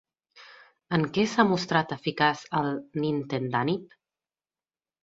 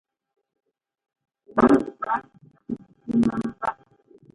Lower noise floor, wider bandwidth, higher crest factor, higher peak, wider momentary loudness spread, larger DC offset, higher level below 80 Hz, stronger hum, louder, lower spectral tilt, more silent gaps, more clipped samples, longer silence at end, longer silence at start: first, under -90 dBFS vs -56 dBFS; second, 8 kHz vs 11 kHz; about the same, 24 dB vs 24 dB; about the same, -6 dBFS vs -4 dBFS; second, 7 LU vs 17 LU; neither; second, -64 dBFS vs -54 dBFS; neither; second, -27 LUFS vs -23 LUFS; second, -6 dB/octave vs -8 dB/octave; neither; neither; first, 1.2 s vs 0.6 s; second, 0.35 s vs 1.55 s